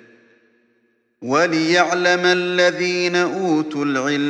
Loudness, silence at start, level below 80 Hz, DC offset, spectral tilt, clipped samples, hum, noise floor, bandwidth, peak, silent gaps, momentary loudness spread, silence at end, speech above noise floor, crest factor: -17 LUFS; 1.2 s; -72 dBFS; under 0.1%; -4 dB/octave; under 0.1%; none; -64 dBFS; 9.4 kHz; -2 dBFS; none; 5 LU; 0 s; 46 dB; 18 dB